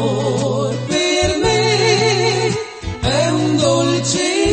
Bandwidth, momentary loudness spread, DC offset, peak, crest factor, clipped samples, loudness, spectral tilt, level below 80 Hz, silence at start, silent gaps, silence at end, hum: 8.8 kHz; 6 LU; under 0.1%; -2 dBFS; 14 dB; under 0.1%; -16 LUFS; -4 dB/octave; -38 dBFS; 0 s; none; 0 s; none